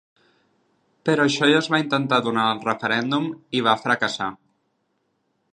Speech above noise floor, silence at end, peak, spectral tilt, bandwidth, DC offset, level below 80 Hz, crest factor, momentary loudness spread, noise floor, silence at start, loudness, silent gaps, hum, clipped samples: 50 dB; 1.2 s; -4 dBFS; -4.5 dB/octave; 10.5 kHz; under 0.1%; -70 dBFS; 20 dB; 8 LU; -71 dBFS; 1.05 s; -21 LUFS; none; none; under 0.1%